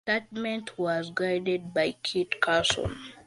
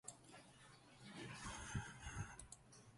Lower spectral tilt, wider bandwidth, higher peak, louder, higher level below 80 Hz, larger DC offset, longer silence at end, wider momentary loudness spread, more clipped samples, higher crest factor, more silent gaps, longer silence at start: about the same, -3.5 dB/octave vs -3.5 dB/octave; about the same, 11.5 kHz vs 11.5 kHz; first, -6 dBFS vs -32 dBFS; first, -28 LUFS vs -53 LUFS; first, -54 dBFS vs -64 dBFS; neither; about the same, 0.05 s vs 0 s; second, 8 LU vs 14 LU; neither; about the same, 22 dB vs 22 dB; neither; about the same, 0.05 s vs 0.05 s